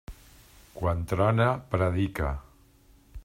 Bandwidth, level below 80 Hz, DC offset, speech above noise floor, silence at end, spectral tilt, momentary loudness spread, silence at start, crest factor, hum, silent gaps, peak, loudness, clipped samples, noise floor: 16 kHz; -44 dBFS; under 0.1%; 32 dB; 0.05 s; -7.5 dB/octave; 17 LU; 0.1 s; 18 dB; none; none; -10 dBFS; -27 LUFS; under 0.1%; -58 dBFS